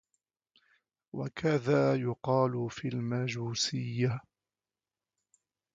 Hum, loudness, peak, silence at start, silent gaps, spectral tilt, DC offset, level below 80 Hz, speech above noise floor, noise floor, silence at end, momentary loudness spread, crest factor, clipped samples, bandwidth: none; -31 LUFS; -14 dBFS; 1.15 s; none; -5.5 dB/octave; under 0.1%; -68 dBFS; over 59 dB; under -90 dBFS; 1.55 s; 11 LU; 20 dB; under 0.1%; 8.6 kHz